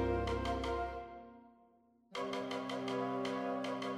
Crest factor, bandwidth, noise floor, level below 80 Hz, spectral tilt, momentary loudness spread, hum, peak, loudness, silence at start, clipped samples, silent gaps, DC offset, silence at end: 16 dB; 13 kHz; -69 dBFS; -52 dBFS; -6 dB/octave; 11 LU; none; -24 dBFS; -39 LUFS; 0 s; under 0.1%; none; under 0.1%; 0 s